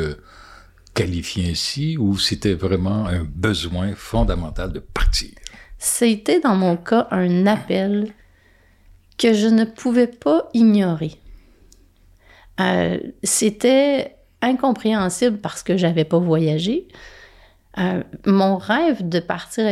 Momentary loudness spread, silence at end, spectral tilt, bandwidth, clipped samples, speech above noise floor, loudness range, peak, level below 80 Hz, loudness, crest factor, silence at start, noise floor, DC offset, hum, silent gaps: 10 LU; 0 s; -5 dB/octave; 15 kHz; under 0.1%; 35 dB; 3 LU; -6 dBFS; -34 dBFS; -19 LUFS; 14 dB; 0 s; -54 dBFS; under 0.1%; none; none